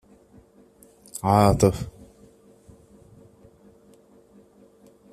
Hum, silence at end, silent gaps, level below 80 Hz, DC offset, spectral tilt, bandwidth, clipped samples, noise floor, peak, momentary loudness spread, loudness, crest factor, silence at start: none; 3.25 s; none; -46 dBFS; under 0.1%; -6.5 dB/octave; 15 kHz; under 0.1%; -55 dBFS; -4 dBFS; 21 LU; -21 LUFS; 24 dB; 1.15 s